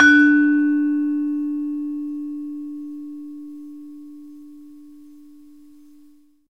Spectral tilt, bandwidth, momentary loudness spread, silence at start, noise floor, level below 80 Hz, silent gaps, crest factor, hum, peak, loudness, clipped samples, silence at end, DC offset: -3 dB/octave; 6 kHz; 26 LU; 0 s; -53 dBFS; -66 dBFS; none; 20 dB; none; 0 dBFS; -20 LUFS; under 0.1%; 1.6 s; 0.3%